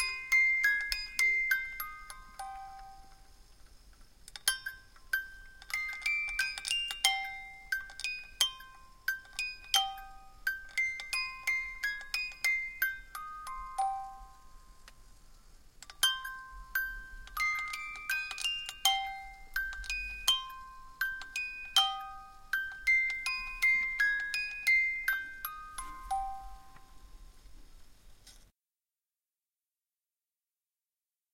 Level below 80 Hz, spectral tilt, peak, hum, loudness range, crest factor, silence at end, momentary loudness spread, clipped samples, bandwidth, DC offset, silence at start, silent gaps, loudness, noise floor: -56 dBFS; 2 dB/octave; -10 dBFS; none; 9 LU; 26 dB; 2.9 s; 18 LU; under 0.1%; 16.5 kHz; under 0.1%; 0 s; none; -32 LUFS; under -90 dBFS